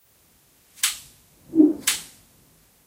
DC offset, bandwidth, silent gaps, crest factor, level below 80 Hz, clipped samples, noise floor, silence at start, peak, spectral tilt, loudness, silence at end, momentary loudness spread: under 0.1%; 16 kHz; none; 22 dB; -64 dBFS; under 0.1%; -59 dBFS; 0.85 s; -4 dBFS; -1.5 dB/octave; -22 LUFS; 0.8 s; 16 LU